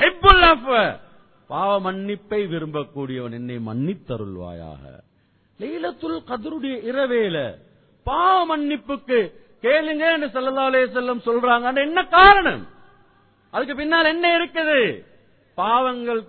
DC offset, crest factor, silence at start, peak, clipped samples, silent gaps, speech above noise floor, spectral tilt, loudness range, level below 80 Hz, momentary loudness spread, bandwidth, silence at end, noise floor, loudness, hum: under 0.1%; 20 dB; 0 s; 0 dBFS; under 0.1%; none; 41 dB; -8 dB/octave; 13 LU; -40 dBFS; 18 LU; 4.6 kHz; 0.05 s; -61 dBFS; -19 LUFS; none